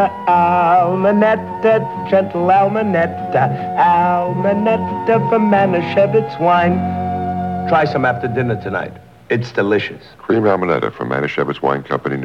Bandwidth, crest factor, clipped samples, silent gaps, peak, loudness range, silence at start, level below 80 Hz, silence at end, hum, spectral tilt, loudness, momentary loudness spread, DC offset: 7.6 kHz; 14 dB; under 0.1%; none; -2 dBFS; 4 LU; 0 s; -52 dBFS; 0 s; none; -8.5 dB/octave; -16 LUFS; 7 LU; 0.2%